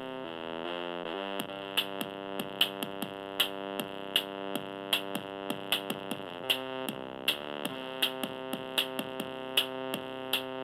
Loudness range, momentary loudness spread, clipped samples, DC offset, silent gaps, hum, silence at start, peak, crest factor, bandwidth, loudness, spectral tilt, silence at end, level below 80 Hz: 1 LU; 8 LU; under 0.1%; under 0.1%; none; none; 0 s; -10 dBFS; 24 dB; over 20 kHz; -33 LUFS; -2.5 dB/octave; 0 s; -74 dBFS